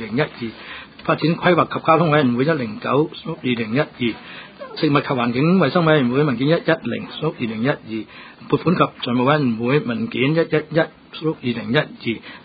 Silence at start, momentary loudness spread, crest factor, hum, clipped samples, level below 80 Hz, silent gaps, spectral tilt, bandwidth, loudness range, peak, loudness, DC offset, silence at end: 0 s; 12 LU; 20 dB; none; under 0.1%; -56 dBFS; none; -10.5 dB/octave; 5 kHz; 2 LU; 0 dBFS; -19 LUFS; under 0.1%; 0.05 s